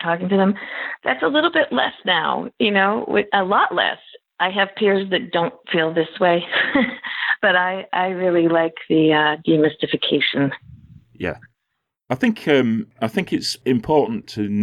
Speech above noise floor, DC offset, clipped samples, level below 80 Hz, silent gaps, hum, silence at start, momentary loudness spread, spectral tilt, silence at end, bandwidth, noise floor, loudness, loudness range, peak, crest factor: 58 dB; under 0.1%; under 0.1%; -58 dBFS; none; none; 0 s; 7 LU; -5.5 dB/octave; 0 s; 13 kHz; -77 dBFS; -19 LUFS; 4 LU; -4 dBFS; 16 dB